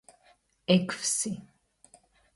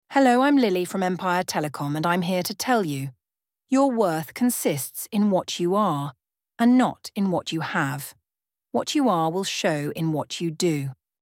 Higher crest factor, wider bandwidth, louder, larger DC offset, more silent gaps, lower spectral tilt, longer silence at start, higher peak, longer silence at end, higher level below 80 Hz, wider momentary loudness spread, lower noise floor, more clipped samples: first, 24 dB vs 18 dB; second, 12 kHz vs 17.5 kHz; second, -28 LUFS vs -24 LUFS; neither; neither; about the same, -4 dB/octave vs -5 dB/octave; first, 0.7 s vs 0.1 s; about the same, -8 dBFS vs -6 dBFS; first, 0.95 s vs 0.3 s; about the same, -70 dBFS vs -70 dBFS; first, 15 LU vs 10 LU; second, -65 dBFS vs under -90 dBFS; neither